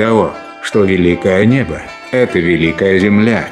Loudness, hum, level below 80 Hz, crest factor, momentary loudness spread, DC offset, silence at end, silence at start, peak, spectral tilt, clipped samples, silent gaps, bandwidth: -12 LUFS; none; -40 dBFS; 12 dB; 9 LU; under 0.1%; 0 s; 0 s; 0 dBFS; -7 dB/octave; under 0.1%; none; 10.5 kHz